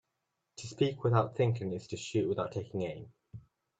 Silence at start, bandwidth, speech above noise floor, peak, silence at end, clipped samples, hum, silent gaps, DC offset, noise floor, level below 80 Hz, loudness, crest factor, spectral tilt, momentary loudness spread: 0.6 s; 8.2 kHz; 51 dB; -12 dBFS; 0.4 s; under 0.1%; none; none; under 0.1%; -84 dBFS; -68 dBFS; -33 LUFS; 22 dB; -6.5 dB/octave; 24 LU